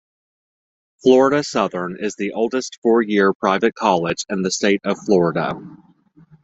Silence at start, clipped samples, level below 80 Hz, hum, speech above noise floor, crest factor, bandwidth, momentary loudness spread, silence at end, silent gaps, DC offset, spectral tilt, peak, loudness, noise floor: 1.05 s; under 0.1%; -60 dBFS; none; 33 dB; 18 dB; 8.2 kHz; 9 LU; 0.7 s; 2.78-2.82 s, 3.35-3.40 s; under 0.1%; -5 dB/octave; -2 dBFS; -18 LUFS; -51 dBFS